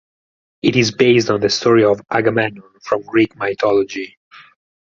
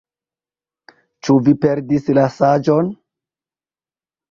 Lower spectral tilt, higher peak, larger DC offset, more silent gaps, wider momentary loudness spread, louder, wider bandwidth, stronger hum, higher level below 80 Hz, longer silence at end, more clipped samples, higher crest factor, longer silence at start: second, -5 dB/octave vs -8 dB/octave; about the same, -2 dBFS vs -2 dBFS; neither; first, 4.17-4.31 s vs none; first, 11 LU vs 6 LU; about the same, -16 LUFS vs -16 LUFS; about the same, 7.6 kHz vs 7.2 kHz; neither; about the same, -54 dBFS vs -56 dBFS; second, 0.45 s vs 1.35 s; neither; about the same, 16 dB vs 16 dB; second, 0.65 s vs 1.25 s